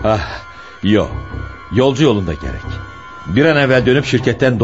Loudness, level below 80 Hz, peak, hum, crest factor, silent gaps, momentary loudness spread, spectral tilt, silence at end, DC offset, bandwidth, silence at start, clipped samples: -15 LUFS; -34 dBFS; 0 dBFS; none; 14 dB; none; 17 LU; -6.5 dB/octave; 0 s; 0.5%; 8 kHz; 0 s; under 0.1%